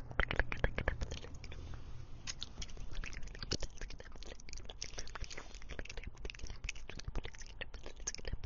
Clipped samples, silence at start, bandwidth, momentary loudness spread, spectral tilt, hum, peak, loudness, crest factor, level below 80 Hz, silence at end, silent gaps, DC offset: under 0.1%; 0 s; 7.4 kHz; 13 LU; -3 dB/octave; none; -12 dBFS; -45 LUFS; 28 dB; -46 dBFS; 0 s; none; under 0.1%